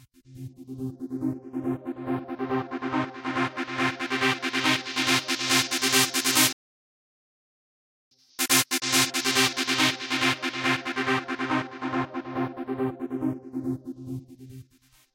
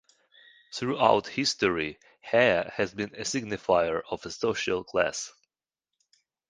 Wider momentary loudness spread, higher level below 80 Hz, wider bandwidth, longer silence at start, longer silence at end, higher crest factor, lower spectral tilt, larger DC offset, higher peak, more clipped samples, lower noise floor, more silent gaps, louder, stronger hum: first, 16 LU vs 12 LU; second, -66 dBFS vs -60 dBFS; first, 17 kHz vs 10 kHz; second, 0.3 s vs 0.7 s; second, 0.55 s vs 1.2 s; about the same, 22 dB vs 22 dB; second, -2 dB/octave vs -3.5 dB/octave; neither; about the same, -6 dBFS vs -6 dBFS; neither; second, -61 dBFS vs -89 dBFS; first, 6.53-8.11 s vs none; about the same, -25 LUFS vs -27 LUFS; neither